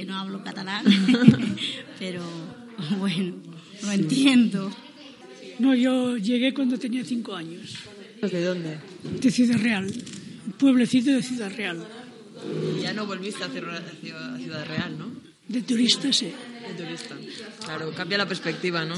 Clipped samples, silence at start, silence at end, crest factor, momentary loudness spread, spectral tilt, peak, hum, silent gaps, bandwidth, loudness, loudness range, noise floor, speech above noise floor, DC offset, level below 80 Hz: under 0.1%; 0 s; 0 s; 26 dB; 19 LU; -5 dB/octave; 0 dBFS; none; none; 11.5 kHz; -24 LUFS; 7 LU; -45 dBFS; 20 dB; under 0.1%; -70 dBFS